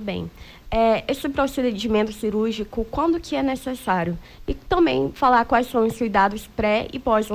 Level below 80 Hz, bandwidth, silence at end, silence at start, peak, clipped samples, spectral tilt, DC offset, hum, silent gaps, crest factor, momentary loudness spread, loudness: -40 dBFS; 16 kHz; 0 s; 0 s; -6 dBFS; under 0.1%; -5.5 dB/octave; under 0.1%; none; none; 16 dB; 9 LU; -22 LUFS